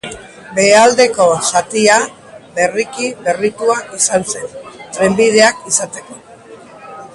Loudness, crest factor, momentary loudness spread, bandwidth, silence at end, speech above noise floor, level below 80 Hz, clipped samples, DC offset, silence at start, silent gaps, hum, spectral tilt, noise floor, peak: -13 LUFS; 14 dB; 20 LU; 11.5 kHz; 0.1 s; 24 dB; -54 dBFS; under 0.1%; under 0.1%; 0.05 s; none; none; -2.5 dB/octave; -37 dBFS; 0 dBFS